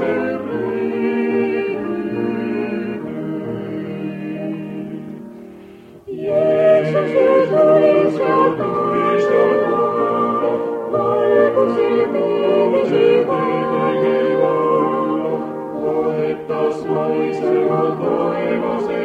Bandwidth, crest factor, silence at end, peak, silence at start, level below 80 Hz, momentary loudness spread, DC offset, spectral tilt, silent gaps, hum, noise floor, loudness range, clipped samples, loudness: 8.2 kHz; 16 dB; 0 s; -2 dBFS; 0 s; -58 dBFS; 12 LU; under 0.1%; -8 dB/octave; none; none; -40 dBFS; 9 LU; under 0.1%; -17 LUFS